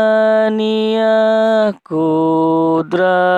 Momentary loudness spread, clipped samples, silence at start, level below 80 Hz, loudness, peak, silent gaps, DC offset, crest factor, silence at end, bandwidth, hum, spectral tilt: 4 LU; under 0.1%; 0 s; -68 dBFS; -14 LUFS; -4 dBFS; none; under 0.1%; 10 dB; 0 s; 8.4 kHz; none; -7 dB/octave